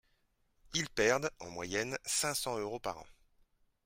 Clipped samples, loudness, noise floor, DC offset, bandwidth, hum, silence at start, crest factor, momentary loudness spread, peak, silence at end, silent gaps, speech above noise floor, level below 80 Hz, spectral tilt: under 0.1%; -35 LUFS; -75 dBFS; under 0.1%; 16 kHz; none; 0.7 s; 22 dB; 12 LU; -14 dBFS; 0.75 s; none; 40 dB; -64 dBFS; -2.5 dB/octave